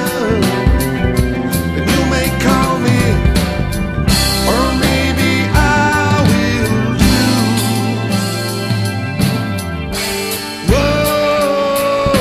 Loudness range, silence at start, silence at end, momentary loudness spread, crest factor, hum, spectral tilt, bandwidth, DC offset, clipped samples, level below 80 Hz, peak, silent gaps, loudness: 4 LU; 0 s; 0 s; 6 LU; 14 dB; none; -5 dB/octave; 14 kHz; under 0.1%; under 0.1%; -22 dBFS; 0 dBFS; none; -14 LUFS